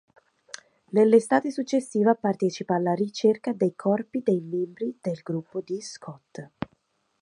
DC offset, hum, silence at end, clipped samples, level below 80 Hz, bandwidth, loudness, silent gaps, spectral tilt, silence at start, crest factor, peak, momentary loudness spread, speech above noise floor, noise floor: under 0.1%; none; 0.55 s; under 0.1%; -68 dBFS; 11 kHz; -25 LUFS; none; -6.5 dB/octave; 0.95 s; 20 dB; -6 dBFS; 21 LU; 45 dB; -69 dBFS